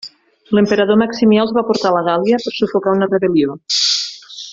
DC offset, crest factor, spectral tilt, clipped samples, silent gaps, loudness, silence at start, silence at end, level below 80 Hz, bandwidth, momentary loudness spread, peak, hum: under 0.1%; 12 dB; -4.5 dB/octave; under 0.1%; none; -15 LUFS; 0.05 s; 0 s; -56 dBFS; 7.8 kHz; 5 LU; -2 dBFS; none